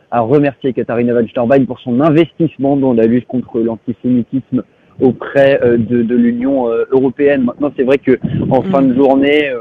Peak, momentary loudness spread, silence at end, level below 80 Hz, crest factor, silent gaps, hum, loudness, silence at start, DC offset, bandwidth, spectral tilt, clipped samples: 0 dBFS; 7 LU; 0 s; -46 dBFS; 12 dB; none; none; -13 LUFS; 0.1 s; under 0.1%; 4.7 kHz; -9.5 dB/octave; 0.2%